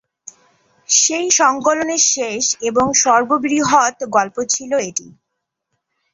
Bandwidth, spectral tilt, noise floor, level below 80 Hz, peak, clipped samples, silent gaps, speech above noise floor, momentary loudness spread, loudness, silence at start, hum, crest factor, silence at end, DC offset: 8 kHz; -1.5 dB/octave; -77 dBFS; -58 dBFS; -2 dBFS; under 0.1%; none; 61 dB; 7 LU; -15 LUFS; 0.9 s; none; 16 dB; 1.05 s; under 0.1%